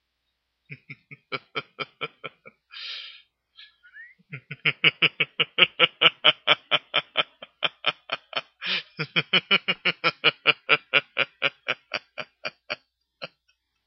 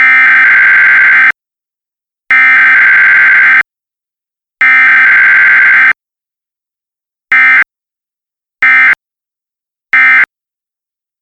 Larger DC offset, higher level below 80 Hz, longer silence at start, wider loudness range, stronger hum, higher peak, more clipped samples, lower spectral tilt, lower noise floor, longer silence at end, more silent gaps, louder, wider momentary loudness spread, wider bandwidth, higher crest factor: neither; second, -80 dBFS vs -58 dBFS; first, 0.7 s vs 0 s; first, 16 LU vs 5 LU; neither; about the same, -2 dBFS vs 0 dBFS; neither; first, -4.5 dB/octave vs -1.5 dB/octave; second, -78 dBFS vs -87 dBFS; second, 0.6 s vs 0.95 s; neither; second, -23 LUFS vs -4 LUFS; first, 23 LU vs 7 LU; second, 6.4 kHz vs 9.6 kHz; first, 26 dB vs 8 dB